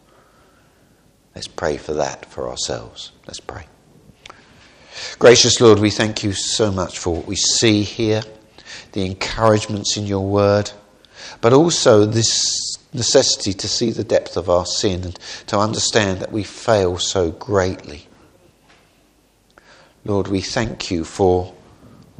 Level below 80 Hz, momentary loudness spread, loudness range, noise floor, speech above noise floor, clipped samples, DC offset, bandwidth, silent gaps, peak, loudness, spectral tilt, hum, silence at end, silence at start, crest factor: -46 dBFS; 20 LU; 11 LU; -57 dBFS; 39 dB; under 0.1%; under 0.1%; 10 kHz; none; 0 dBFS; -17 LUFS; -4 dB/octave; none; 0.7 s; 1.35 s; 20 dB